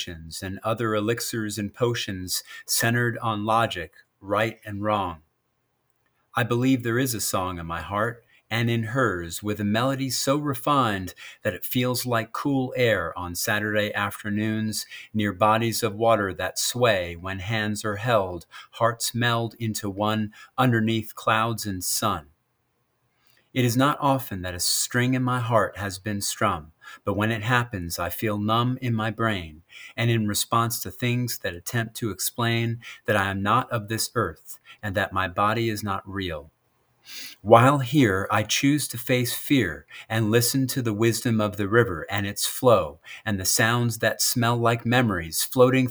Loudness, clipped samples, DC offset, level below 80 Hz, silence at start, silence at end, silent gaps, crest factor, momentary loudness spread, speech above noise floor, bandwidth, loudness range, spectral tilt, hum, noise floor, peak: -24 LUFS; under 0.1%; under 0.1%; -60 dBFS; 0 s; 0 s; none; 24 dB; 10 LU; 48 dB; over 20 kHz; 4 LU; -4.5 dB/octave; none; -72 dBFS; 0 dBFS